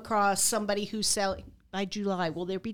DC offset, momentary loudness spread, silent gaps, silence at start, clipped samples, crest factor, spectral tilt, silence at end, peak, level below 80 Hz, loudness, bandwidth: under 0.1%; 10 LU; none; 0 s; under 0.1%; 16 dB; -3 dB/octave; 0 s; -14 dBFS; -56 dBFS; -29 LUFS; 19 kHz